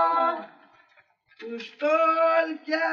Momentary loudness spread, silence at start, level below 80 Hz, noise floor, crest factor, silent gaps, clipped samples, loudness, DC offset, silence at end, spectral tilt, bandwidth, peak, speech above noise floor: 17 LU; 0 s; under -90 dBFS; -62 dBFS; 14 dB; none; under 0.1%; -24 LUFS; under 0.1%; 0 s; -4 dB/octave; 7 kHz; -12 dBFS; 38 dB